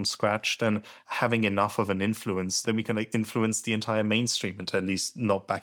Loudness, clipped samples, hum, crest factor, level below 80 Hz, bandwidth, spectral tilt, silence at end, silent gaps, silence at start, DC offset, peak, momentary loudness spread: -28 LUFS; under 0.1%; none; 18 dB; -70 dBFS; 19.5 kHz; -4 dB/octave; 0 s; none; 0 s; under 0.1%; -10 dBFS; 4 LU